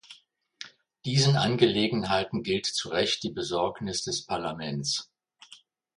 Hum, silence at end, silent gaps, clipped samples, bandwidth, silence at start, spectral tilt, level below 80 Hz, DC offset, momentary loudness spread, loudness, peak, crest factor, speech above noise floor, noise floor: none; 0.4 s; none; under 0.1%; 11.5 kHz; 0.1 s; -4.5 dB/octave; -60 dBFS; under 0.1%; 12 LU; -27 LUFS; -6 dBFS; 22 dB; 30 dB; -57 dBFS